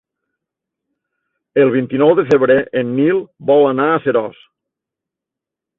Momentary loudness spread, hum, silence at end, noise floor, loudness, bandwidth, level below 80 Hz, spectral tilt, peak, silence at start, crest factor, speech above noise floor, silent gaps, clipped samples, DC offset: 7 LU; none; 1.45 s; -84 dBFS; -14 LUFS; 6.6 kHz; -58 dBFS; -8.5 dB/octave; -2 dBFS; 1.55 s; 16 dB; 71 dB; none; under 0.1%; under 0.1%